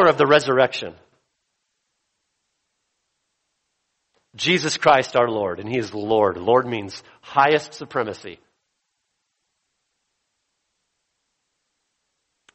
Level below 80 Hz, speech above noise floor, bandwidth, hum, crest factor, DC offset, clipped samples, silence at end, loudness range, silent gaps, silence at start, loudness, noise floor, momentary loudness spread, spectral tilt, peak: -64 dBFS; 55 dB; 8.4 kHz; none; 22 dB; under 0.1%; under 0.1%; 4.2 s; 10 LU; none; 0 s; -20 LUFS; -76 dBFS; 14 LU; -4.5 dB/octave; -2 dBFS